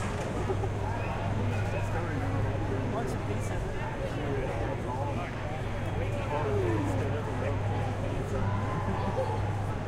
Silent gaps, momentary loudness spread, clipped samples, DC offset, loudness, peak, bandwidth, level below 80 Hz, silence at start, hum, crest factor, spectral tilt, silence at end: none; 4 LU; under 0.1%; under 0.1%; -32 LUFS; -18 dBFS; 11.5 kHz; -40 dBFS; 0 s; none; 12 dB; -7 dB/octave; 0 s